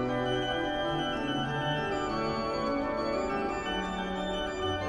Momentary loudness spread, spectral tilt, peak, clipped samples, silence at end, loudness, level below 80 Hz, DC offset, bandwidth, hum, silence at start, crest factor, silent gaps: 3 LU; -5.5 dB/octave; -18 dBFS; under 0.1%; 0 s; -31 LUFS; -48 dBFS; under 0.1%; 12.5 kHz; none; 0 s; 12 dB; none